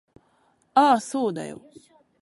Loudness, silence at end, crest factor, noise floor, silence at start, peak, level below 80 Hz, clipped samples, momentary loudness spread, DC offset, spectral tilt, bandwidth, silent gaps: -22 LUFS; 0.65 s; 20 dB; -65 dBFS; 0.75 s; -4 dBFS; -72 dBFS; under 0.1%; 19 LU; under 0.1%; -4.5 dB/octave; 11.5 kHz; none